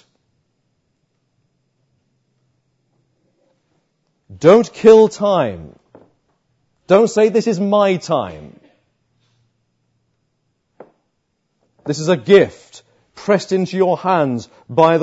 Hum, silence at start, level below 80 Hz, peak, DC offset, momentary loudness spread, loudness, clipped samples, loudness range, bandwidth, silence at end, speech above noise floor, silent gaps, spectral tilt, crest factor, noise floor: none; 4.3 s; -60 dBFS; 0 dBFS; under 0.1%; 15 LU; -14 LUFS; under 0.1%; 8 LU; 8 kHz; 0 s; 56 dB; none; -6 dB/octave; 18 dB; -69 dBFS